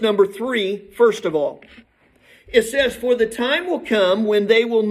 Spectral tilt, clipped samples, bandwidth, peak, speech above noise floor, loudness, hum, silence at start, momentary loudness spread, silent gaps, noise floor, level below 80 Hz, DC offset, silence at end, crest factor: -4 dB/octave; under 0.1%; 14 kHz; -2 dBFS; 35 dB; -19 LUFS; none; 0 s; 6 LU; none; -53 dBFS; -54 dBFS; under 0.1%; 0 s; 18 dB